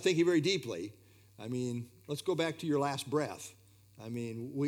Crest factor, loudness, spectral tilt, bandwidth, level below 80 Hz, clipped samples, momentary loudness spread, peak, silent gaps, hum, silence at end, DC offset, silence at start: 18 dB; -34 LUFS; -5 dB/octave; 18.5 kHz; -78 dBFS; under 0.1%; 18 LU; -16 dBFS; none; none; 0 s; under 0.1%; 0 s